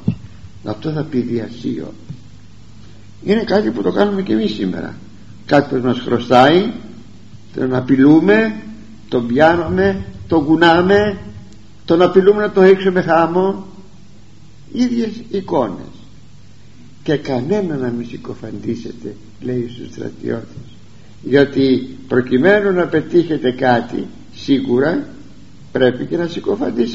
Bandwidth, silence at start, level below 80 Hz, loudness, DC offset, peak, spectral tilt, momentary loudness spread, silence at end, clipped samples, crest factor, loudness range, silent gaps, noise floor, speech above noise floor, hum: 7.8 kHz; 0.05 s; -46 dBFS; -16 LUFS; 1%; 0 dBFS; -5 dB/octave; 19 LU; 0 s; under 0.1%; 16 dB; 9 LU; none; -43 dBFS; 28 dB; none